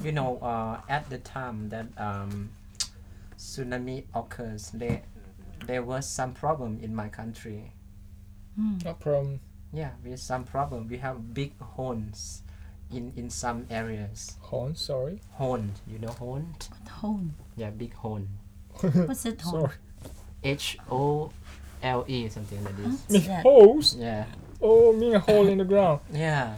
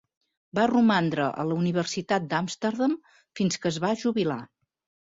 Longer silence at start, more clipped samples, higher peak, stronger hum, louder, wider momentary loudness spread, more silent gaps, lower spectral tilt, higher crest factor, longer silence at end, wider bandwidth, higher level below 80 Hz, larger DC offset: second, 0 s vs 0.55 s; neither; first, -4 dBFS vs -10 dBFS; neither; about the same, -27 LUFS vs -26 LUFS; first, 20 LU vs 8 LU; neither; about the same, -5.5 dB/octave vs -5.5 dB/octave; first, 22 dB vs 16 dB; second, 0 s vs 0.6 s; first, 16.5 kHz vs 7.8 kHz; first, -46 dBFS vs -66 dBFS; neither